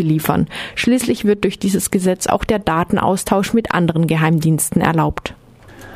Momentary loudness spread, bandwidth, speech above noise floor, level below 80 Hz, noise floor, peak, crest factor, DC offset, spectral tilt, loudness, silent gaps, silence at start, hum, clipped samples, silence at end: 4 LU; 15.5 kHz; 24 dB; -40 dBFS; -40 dBFS; 0 dBFS; 16 dB; under 0.1%; -5.5 dB/octave; -17 LUFS; none; 0 s; none; under 0.1%; 0 s